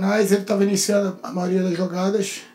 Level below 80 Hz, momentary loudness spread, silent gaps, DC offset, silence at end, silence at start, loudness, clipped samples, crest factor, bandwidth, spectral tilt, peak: -74 dBFS; 6 LU; none; under 0.1%; 0.05 s; 0 s; -21 LUFS; under 0.1%; 16 dB; 16 kHz; -5 dB/octave; -4 dBFS